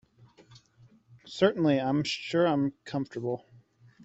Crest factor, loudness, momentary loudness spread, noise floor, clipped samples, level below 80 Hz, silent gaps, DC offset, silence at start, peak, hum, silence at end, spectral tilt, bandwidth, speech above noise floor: 22 dB; -28 LUFS; 10 LU; -60 dBFS; under 0.1%; -68 dBFS; none; under 0.1%; 1.1 s; -8 dBFS; none; 0 s; -6 dB/octave; 8.2 kHz; 33 dB